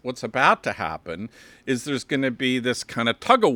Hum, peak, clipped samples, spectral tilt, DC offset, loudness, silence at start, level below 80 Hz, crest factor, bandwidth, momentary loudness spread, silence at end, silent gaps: none; -2 dBFS; under 0.1%; -4.5 dB/octave; under 0.1%; -23 LUFS; 0.05 s; -62 dBFS; 20 dB; 17.5 kHz; 15 LU; 0 s; none